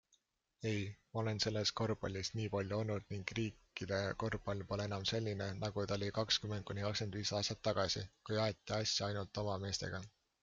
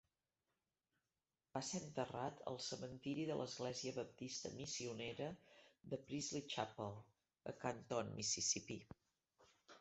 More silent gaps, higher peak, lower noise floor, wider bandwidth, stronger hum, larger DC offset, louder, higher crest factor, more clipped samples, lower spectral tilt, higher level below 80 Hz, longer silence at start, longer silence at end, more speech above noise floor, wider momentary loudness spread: neither; first, -20 dBFS vs -26 dBFS; second, -78 dBFS vs under -90 dBFS; about the same, 7.8 kHz vs 8.2 kHz; neither; neither; first, -39 LUFS vs -46 LUFS; about the same, 20 dB vs 22 dB; neither; about the same, -4.5 dB/octave vs -3.5 dB/octave; first, -64 dBFS vs -78 dBFS; second, 0.6 s vs 1.55 s; first, 0.35 s vs 0 s; second, 39 dB vs over 43 dB; second, 6 LU vs 13 LU